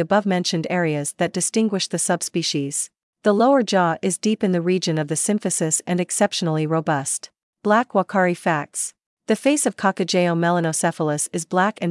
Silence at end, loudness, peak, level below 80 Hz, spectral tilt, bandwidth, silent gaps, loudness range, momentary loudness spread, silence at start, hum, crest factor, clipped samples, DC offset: 0 s; -21 LUFS; -4 dBFS; -74 dBFS; -4 dB/octave; 12 kHz; 3.03-3.13 s, 7.43-7.53 s, 9.06-9.17 s; 2 LU; 6 LU; 0 s; none; 16 dB; under 0.1%; under 0.1%